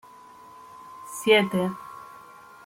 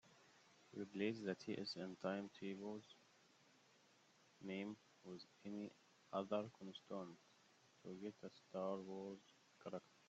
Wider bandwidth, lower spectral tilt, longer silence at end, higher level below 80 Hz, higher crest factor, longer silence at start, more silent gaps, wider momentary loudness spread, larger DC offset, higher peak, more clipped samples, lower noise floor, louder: first, 16.5 kHz vs 8 kHz; about the same, -4.5 dB/octave vs -4.5 dB/octave; first, 0.6 s vs 0.05 s; first, -70 dBFS vs under -90 dBFS; about the same, 22 dB vs 22 dB; first, 0.75 s vs 0.05 s; neither; first, 26 LU vs 16 LU; neither; first, -6 dBFS vs -30 dBFS; neither; second, -48 dBFS vs -74 dBFS; first, -23 LUFS vs -51 LUFS